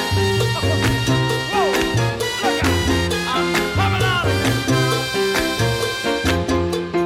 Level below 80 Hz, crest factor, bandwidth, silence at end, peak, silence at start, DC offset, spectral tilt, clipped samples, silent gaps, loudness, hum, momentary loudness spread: -36 dBFS; 12 dB; 16.5 kHz; 0 s; -8 dBFS; 0 s; under 0.1%; -4.5 dB/octave; under 0.1%; none; -19 LUFS; none; 2 LU